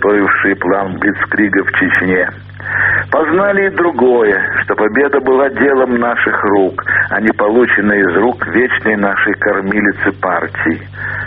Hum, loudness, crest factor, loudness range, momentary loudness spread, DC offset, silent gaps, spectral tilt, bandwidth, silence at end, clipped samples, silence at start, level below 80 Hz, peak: none; -12 LUFS; 12 dB; 1 LU; 5 LU; under 0.1%; none; -4.5 dB/octave; 4 kHz; 0 s; under 0.1%; 0 s; -46 dBFS; 0 dBFS